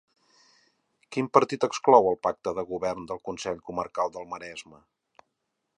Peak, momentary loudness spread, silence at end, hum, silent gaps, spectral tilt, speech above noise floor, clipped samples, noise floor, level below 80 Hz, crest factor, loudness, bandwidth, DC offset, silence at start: -2 dBFS; 18 LU; 1.15 s; none; none; -5 dB/octave; 54 dB; under 0.1%; -80 dBFS; -64 dBFS; 26 dB; -26 LUFS; 10.5 kHz; under 0.1%; 1.1 s